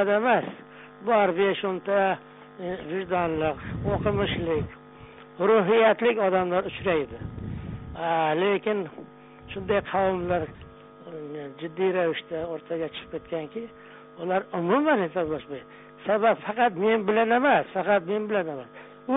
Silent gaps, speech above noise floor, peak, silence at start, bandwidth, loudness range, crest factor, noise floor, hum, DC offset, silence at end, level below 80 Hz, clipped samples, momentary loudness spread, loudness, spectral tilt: none; 22 dB; -8 dBFS; 0 s; 4 kHz; 6 LU; 18 dB; -47 dBFS; none; under 0.1%; 0 s; -52 dBFS; under 0.1%; 16 LU; -25 LUFS; -4 dB/octave